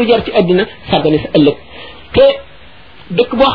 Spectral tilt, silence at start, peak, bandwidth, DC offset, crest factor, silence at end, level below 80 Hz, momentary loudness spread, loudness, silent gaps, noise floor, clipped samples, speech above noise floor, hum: -8.5 dB/octave; 0 s; 0 dBFS; 5.4 kHz; 1%; 12 dB; 0 s; -38 dBFS; 14 LU; -12 LUFS; none; -39 dBFS; under 0.1%; 28 dB; none